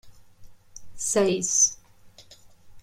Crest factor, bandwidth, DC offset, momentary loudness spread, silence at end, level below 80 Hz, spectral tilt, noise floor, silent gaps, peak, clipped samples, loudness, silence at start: 20 dB; 16 kHz; under 0.1%; 7 LU; 0 s; -58 dBFS; -2.5 dB/octave; -51 dBFS; none; -8 dBFS; under 0.1%; -22 LUFS; 0.05 s